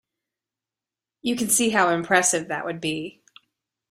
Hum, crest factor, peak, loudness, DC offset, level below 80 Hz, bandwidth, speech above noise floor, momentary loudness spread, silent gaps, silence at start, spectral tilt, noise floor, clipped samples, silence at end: none; 22 dB; -4 dBFS; -22 LUFS; under 0.1%; -66 dBFS; 16 kHz; 67 dB; 12 LU; none; 1.25 s; -2.5 dB/octave; -90 dBFS; under 0.1%; 0.8 s